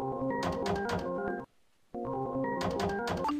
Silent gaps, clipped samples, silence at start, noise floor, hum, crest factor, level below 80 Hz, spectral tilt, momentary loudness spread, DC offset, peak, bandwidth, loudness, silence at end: none; under 0.1%; 0 s; -64 dBFS; none; 14 dB; -54 dBFS; -6 dB/octave; 9 LU; under 0.1%; -20 dBFS; 15.5 kHz; -34 LUFS; 0 s